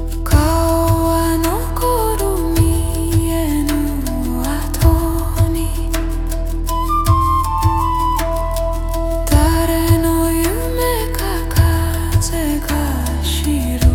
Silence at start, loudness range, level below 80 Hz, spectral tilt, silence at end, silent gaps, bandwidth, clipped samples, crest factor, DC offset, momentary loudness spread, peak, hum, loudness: 0 s; 2 LU; -20 dBFS; -5.5 dB/octave; 0 s; none; 18 kHz; under 0.1%; 14 dB; under 0.1%; 6 LU; 0 dBFS; none; -17 LUFS